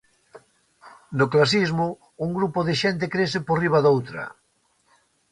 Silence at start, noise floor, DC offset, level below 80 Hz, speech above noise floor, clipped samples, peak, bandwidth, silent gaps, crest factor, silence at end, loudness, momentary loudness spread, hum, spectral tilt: 0.35 s; -66 dBFS; under 0.1%; -58 dBFS; 45 dB; under 0.1%; -4 dBFS; 11 kHz; none; 20 dB; 1 s; -22 LUFS; 13 LU; none; -6 dB/octave